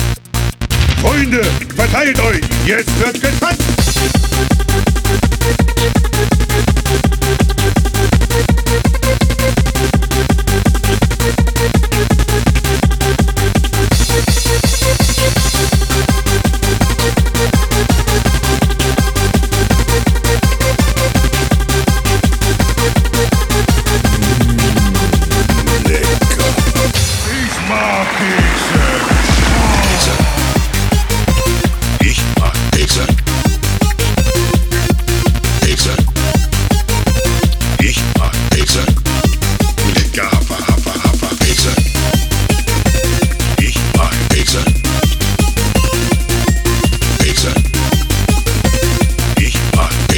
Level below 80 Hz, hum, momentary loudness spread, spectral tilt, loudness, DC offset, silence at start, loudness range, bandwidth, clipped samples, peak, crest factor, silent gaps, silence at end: -16 dBFS; none; 2 LU; -4.5 dB/octave; -13 LUFS; under 0.1%; 0 s; 1 LU; over 20 kHz; under 0.1%; 0 dBFS; 12 dB; none; 0 s